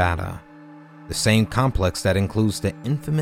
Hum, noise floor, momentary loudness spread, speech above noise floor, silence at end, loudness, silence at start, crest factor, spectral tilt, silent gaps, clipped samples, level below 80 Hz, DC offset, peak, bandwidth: none; -44 dBFS; 11 LU; 23 dB; 0 s; -22 LUFS; 0 s; 18 dB; -5.5 dB/octave; none; under 0.1%; -36 dBFS; under 0.1%; -4 dBFS; 16.5 kHz